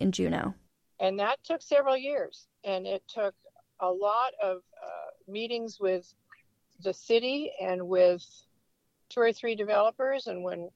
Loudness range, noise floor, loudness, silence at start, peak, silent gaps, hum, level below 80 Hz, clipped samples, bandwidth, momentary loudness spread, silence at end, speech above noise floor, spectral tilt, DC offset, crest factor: 4 LU; -75 dBFS; -30 LUFS; 0 s; -12 dBFS; none; none; -68 dBFS; under 0.1%; 9 kHz; 12 LU; 0.05 s; 46 dB; -5 dB/octave; under 0.1%; 18 dB